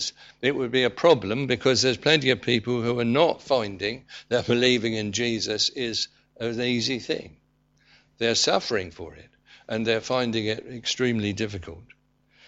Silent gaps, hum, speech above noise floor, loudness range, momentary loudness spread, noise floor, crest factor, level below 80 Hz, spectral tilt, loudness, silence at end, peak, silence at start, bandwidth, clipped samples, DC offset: none; none; 39 dB; 6 LU; 11 LU; -64 dBFS; 20 dB; -58 dBFS; -4 dB/octave; -24 LUFS; 0.65 s; -6 dBFS; 0 s; 8.2 kHz; under 0.1%; under 0.1%